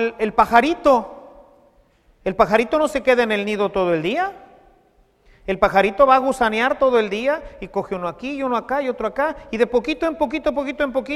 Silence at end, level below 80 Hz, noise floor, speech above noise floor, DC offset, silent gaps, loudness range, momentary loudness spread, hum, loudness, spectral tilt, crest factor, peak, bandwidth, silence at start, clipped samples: 0 s; -46 dBFS; -57 dBFS; 38 dB; under 0.1%; none; 4 LU; 12 LU; none; -19 LUFS; -5 dB/octave; 20 dB; 0 dBFS; 14 kHz; 0 s; under 0.1%